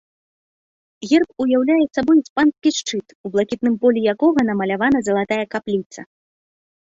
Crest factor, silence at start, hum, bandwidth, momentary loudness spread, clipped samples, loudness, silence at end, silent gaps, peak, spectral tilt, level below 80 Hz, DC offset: 16 dB; 1 s; none; 8 kHz; 9 LU; under 0.1%; -18 LUFS; 0.85 s; 2.30-2.36 s, 3.15-3.24 s, 5.86-5.90 s; -4 dBFS; -5 dB/octave; -58 dBFS; under 0.1%